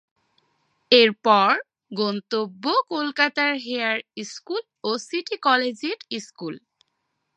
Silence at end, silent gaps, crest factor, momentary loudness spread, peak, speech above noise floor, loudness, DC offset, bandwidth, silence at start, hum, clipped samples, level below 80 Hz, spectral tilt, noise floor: 0.8 s; none; 22 dB; 18 LU; -2 dBFS; 53 dB; -22 LUFS; under 0.1%; 9.6 kHz; 0.9 s; none; under 0.1%; -82 dBFS; -3.5 dB/octave; -76 dBFS